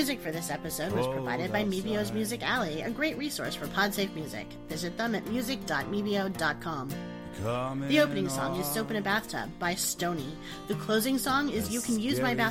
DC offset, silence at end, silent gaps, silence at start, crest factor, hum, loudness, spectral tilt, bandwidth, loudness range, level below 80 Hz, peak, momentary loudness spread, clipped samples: under 0.1%; 0 s; none; 0 s; 20 dB; none; -31 LUFS; -4 dB/octave; 16.5 kHz; 2 LU; -54 dBFS; -12 dBFS; 9 LU; under 0.1%